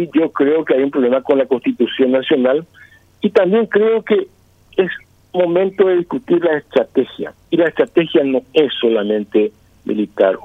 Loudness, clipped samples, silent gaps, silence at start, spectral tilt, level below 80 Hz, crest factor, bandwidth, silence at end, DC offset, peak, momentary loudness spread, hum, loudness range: -16 LUFS; under 0.1%; none; 0 s; -7.5 dB/octave; -60 dBFS; 16 dB; 5.4 kHz; 0.05 s; under 0.1%; 0 dBFS; 7 LU; none; 1 LU